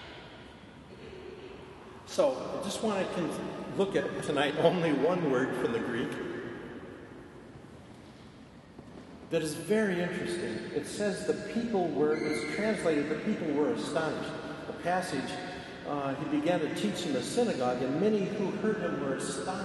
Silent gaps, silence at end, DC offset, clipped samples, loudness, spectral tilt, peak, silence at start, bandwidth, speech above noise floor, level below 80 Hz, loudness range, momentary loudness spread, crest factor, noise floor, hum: none; 0 s; under 0.1%; under 0.1%; -31 LUFS; -5.5 dB/octave; -10 dBFS; 0 s; 12.5 kHz; 21 dB; -62 dBFS; 6 LU; 20 LU; 22 dB; -52 dBFS; none